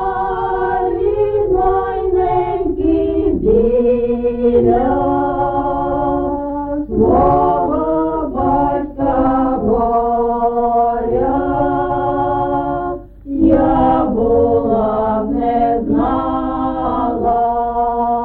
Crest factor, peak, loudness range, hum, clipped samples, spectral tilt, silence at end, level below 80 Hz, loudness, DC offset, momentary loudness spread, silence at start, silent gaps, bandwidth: 14 dB; -2 dBFS; 2 LU; none; under 0.1%; -11.5 dB/octave; 0 s; -30 dBFS; -16 LUFS; under 0.1%; 6 LU; 0 s; none; 4.3 kHz